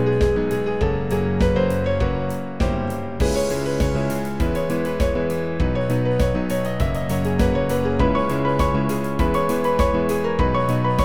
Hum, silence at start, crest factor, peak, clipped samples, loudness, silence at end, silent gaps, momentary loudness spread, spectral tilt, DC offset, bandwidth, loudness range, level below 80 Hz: none; 0 s; 16 dB; -4 dBFS; under 0.1%; -21 LUFS; 0 s; none; 4 LU; -7 dB/octave; 3%; over 20 kHz; 2 LU; -28 dBFS